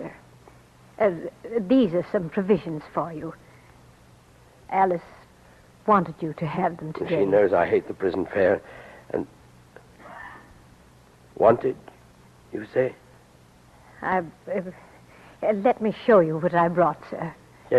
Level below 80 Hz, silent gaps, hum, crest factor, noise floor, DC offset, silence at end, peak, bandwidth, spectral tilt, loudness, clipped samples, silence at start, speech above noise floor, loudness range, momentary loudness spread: -58 dBFS; none; none; 20 dB; -53 dBFS; under 0.1%; 0 s; -4 dBFS; 12 kHz; -8 dB/octave; -24 LUFS; under 0.1%; 0 s; 30 dB; 7 LU; 18 LU